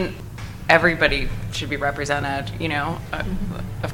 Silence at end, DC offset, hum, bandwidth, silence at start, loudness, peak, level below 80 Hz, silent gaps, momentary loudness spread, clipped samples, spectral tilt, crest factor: 0 s; under 0.1%; none; 17 kHz; 0 s; -22 LUFS; 0 dBFS; -34 dBFS; none; 14 LU; under 0.1%; -5 dB/octave; 22 dB